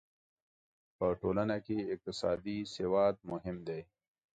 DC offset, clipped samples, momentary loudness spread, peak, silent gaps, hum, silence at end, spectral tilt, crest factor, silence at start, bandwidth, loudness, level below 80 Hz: under 0.1%; under 0.1%; 10 LU; -18 dBFS; none; none; 0.5 s; -6.5 dB/octave; 18 dB; 1 s; 9 kHz; -36 LUFS; -62 dBFS